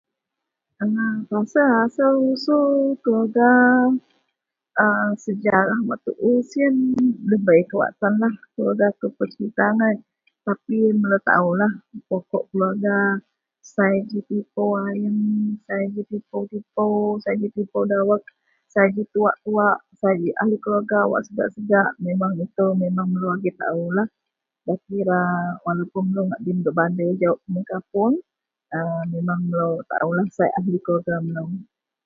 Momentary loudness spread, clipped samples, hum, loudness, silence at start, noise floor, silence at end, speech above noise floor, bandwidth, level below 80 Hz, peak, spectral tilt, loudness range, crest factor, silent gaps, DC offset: 9 LU; under 0.1%; none; -21 LUFS; 0.8 s; -82 dBFS; 0.45 s; 62 dB; 7.2 kHz; -68 dBFS; -2 dBFS; -8.5 dB/octave; 5 LU; 18 dB; none; under 0.1%